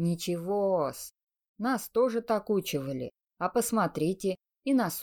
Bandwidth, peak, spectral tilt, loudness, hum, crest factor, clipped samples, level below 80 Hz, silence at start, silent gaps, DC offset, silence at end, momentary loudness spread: 19.5 kHz; -14 dBFS; -5.5 dB/octave; -30 LUFS; none; 16 dB; under 0.1%; -66 dBFS; 0 s; 1.23-1.27 s, 1.48-1.54 s; under 0.1%; 0 s; 9 LU